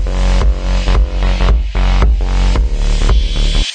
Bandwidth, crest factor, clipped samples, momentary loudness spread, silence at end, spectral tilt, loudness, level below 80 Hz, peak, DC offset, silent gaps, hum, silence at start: 9 kHz; 10 dB; under 0.1%; 2 LU; 0 s; -5.5 dB/octave; -15 LUFS; -12 dBFS; 0 dBFS; under 0.1%; none; none; 0 s